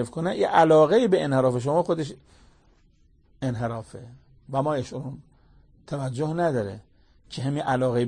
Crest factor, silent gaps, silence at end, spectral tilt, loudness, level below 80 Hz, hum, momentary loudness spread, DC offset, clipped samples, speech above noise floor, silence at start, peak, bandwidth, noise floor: 20 dB; none; 0 s; -7 dB/octave; -24 LUFS; -56 dBFS; none; 19 LU; under 0.1%; under 0.1%; 36 dB; 0 s; -6 dBFS; 9.8 kHz; -59 dBFS